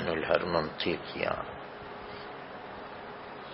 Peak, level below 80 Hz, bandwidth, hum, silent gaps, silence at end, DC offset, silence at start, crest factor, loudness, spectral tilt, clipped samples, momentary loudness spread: -8 dBFS; -58 dBFS; 5.6 kHz; none; none; 0 s; under 0.1%; 0 s; 26 dB; -34 LUFS; -3 dB/octave; under 0.1%; 15 LU